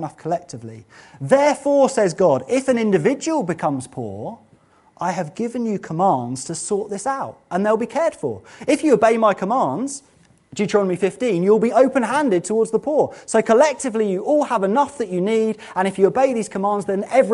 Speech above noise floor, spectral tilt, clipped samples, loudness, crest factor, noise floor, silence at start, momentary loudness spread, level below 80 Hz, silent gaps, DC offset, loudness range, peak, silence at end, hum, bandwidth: 36 dB; -5.5 dB/octave; under 0.1%; -19 LUFS; 18 dB; -55 dBFS; 0 s; 12 LU; -62 dBFS; none; under 0.1%; 6 LU; -2 dBFS; 0 s; none; 11.5 kHz